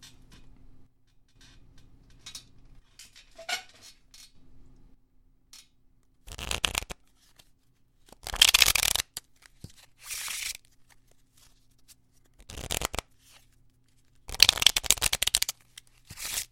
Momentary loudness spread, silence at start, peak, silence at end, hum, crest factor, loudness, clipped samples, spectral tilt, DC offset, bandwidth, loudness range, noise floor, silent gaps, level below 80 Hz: 27 LU; 0 s; 0 dBFS; 0.05 s; none; 32 dB; -25 LUFS; under 0.1%; 0.5 dB/octave; under 0.1%; 17 kHz; 17 LU; -66 dBFS; none; -50 dBFS